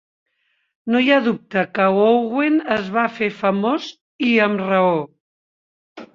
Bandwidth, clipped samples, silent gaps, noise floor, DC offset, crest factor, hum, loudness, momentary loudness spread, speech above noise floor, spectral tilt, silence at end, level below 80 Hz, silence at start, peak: 7.2 kHz; under 0.1%; 4.01-4.19 s, 5.20-5.96 s; under -90 dBFS; under 0.1%; 18 dB; none; -18 LUFS; 8 LU; over 72 dB; -7 dB/octave; 0.1 s; -64 dBFS; 0.85 s; -2 dBFS